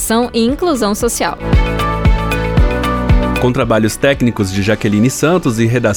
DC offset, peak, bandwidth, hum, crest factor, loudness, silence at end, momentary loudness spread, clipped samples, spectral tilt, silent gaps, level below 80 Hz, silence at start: under 0.1%; 0 dBFS; 19 kHz; none; 12 dB; -14 LUFS; 0 s; 3 LU; under 0.1%; -5.5 dB/octave; none; -20 dBFS; 0 s